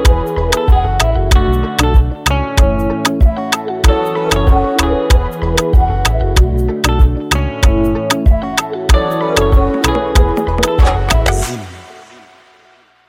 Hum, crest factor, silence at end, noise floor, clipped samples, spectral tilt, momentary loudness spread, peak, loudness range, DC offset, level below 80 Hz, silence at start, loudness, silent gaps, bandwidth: none; 12 dB; 1.1 s; -48 dBFS; under 0.1%; -5 dB/octave; 4 LU; 0 dBFS; 1 LU; under 0.1%; -14 dBFS; 0 s; -14 LUFS; none; 16.5 kHz